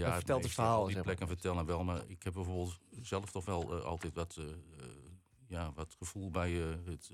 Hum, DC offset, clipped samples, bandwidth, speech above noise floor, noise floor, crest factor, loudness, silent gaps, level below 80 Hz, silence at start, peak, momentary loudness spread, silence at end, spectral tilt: none; under 0.1%; under 0.1%; 15.5 kHz; 21 dB; -59 dBFS; 20 dB; -39 LUFS; none; -58 dBFS; 0 s; -18 dBFS; 15 LU; 0 s; -6 dB/octave